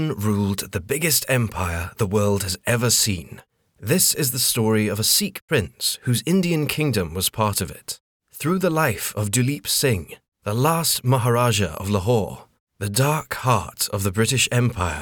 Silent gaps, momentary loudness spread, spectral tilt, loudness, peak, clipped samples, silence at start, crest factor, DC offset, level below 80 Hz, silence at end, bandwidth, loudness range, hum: 5.42-5.48 s, 8.00-8.20 s, 10.28-10.32 s, 12.60-12.67 s; 9 LU; -4 dB/octave; -21 LUFS; -4 dBFS; under 0.1%; 0 s; 18 dB; under 0.1%; -50 dBFS; 0 s; over 20 kHz; 3 LU; none